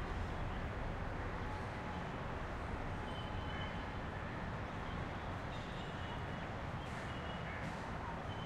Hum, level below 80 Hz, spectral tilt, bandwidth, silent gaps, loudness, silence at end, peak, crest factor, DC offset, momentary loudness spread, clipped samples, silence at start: none; -50 dBFS; -6.5 dB/octave; 12.5 kHz; none; -44 LUFS; 0 s; -30 dBFS; 14 dB; under 0.1%; 1 LU; under 0.1%; 0 s